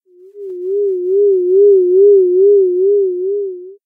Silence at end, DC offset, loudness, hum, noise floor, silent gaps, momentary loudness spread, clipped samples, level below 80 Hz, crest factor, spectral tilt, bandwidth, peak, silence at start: 0.1 s; under 0.1%; -12 LUFS; none; -32 dBFS; none; 15 LU; under 0.1%; -86 dBFS; 10 dB; -10 dB/octave; 0.6 kHz; -2 dBFS; 0.35 s